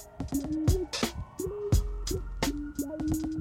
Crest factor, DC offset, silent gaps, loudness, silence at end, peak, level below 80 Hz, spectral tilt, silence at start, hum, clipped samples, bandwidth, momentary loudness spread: 16 dB; under 0.1%; none; -32 LUFS; 0 s; -14 dBFS; -36 dBFS; -5.5 dB/octave; 0 s; none; under 0.1%; 16.5 kHz; 7 LU